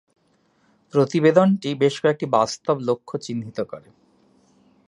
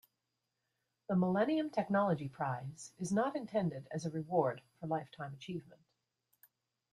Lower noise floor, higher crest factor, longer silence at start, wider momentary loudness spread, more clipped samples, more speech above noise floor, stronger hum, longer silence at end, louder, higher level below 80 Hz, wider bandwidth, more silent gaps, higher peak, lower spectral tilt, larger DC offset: second, -63 dBFS vs -87 dBFS; about the same, 20 dB vs 18 dB; second, 0.95 s vs 1.1 s; about the same, 14 LU vs 14 LU; neither; second, 43 dB vs 51 dB; neither; about the same, 1.1 s vs 1.15 s; first, -21 LUFS vs -37 LUFS; first, -68 dBFS vs -76 dBFS; second, 11 kHz vs 14.5 kHz; neither; first, -2 dBFS vs -20 dBFS; about the same, -6 dB/octave vs -7 dB/octave; neither